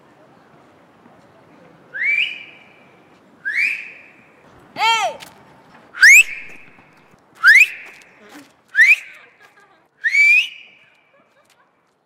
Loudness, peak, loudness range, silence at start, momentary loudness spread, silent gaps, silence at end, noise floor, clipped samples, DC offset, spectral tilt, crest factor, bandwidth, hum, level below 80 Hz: -12 LUFS; -2 dBFS; 10 LU; 1.95 s; 24 LU; none; 1.55 s; -60 dBFS; under 0.1%; under 0.1%; 2 dB/octave; 18 dB; 16 kHz; none; -64 dBFS